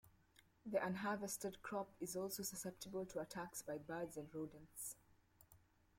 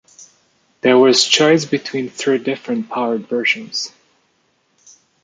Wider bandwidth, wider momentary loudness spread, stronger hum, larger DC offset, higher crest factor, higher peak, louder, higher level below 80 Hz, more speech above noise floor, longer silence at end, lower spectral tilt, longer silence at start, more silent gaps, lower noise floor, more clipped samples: first, 16.5 kHz vs 9.6 kHz; second, 8 LU vs 13 LU; neither; neither; about the same, 22 dB vs 18 dB; second, -26 dBFS vs 0 dBFS; second, -47 LUFS vs -16 LUFS; second, -76 dBFS vs -66 dBFS; second, 26 dB vs 47 dB; second, 0.4 s vs 1.35 s; about the same, -4 dB/octave vs -3 dB/octave; second, 0.05 s vs 0.85 s; neither; first, -73 dBFS vs -63 dBFS; neither